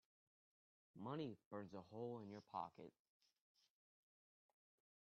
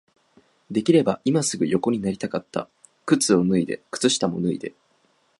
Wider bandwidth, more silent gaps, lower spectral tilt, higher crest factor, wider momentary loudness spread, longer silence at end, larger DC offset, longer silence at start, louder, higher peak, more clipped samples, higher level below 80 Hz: second, 6.6 kHz vs 11.5 kHz; first, 1.45-1.51 s vs none; first, -6.5 dB/octave vs -5 dB/octave; about the same, 22 dB vs 20 dB; second, 7 LU vs 13 LU; first, 2.15 s vs 0.7 s; neither; first, 0.95 s vs 0.7 s; second, -53 LUFS vs -22 LUFS; second, -34 dBFS vs -4 dBFS; neither; second, under -90 dBFS vs -60 dBFS